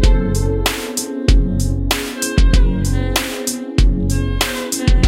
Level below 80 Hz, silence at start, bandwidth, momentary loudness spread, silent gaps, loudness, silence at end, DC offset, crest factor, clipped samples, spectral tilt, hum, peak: -16 dBFS; 0 s; 16.5 kHz; 4 LU; none; -18 LUFS; 0 s; under 0.1%; 14 dB; under 0.1%; -4.5 dB/octave; none; 0 dBFS